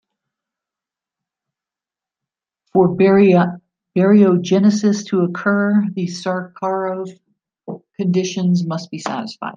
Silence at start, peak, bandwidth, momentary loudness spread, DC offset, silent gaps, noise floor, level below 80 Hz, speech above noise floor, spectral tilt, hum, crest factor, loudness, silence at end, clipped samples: 2.75 s; -2 dBFS; 7.6 kHz; 13 LU; under 0.1%; none; -89 dBFS; -64 dBFS; 73 dB; -7 dB/octave; none; 16 dB; -17 LUFS; 0.05 s; under 0.1%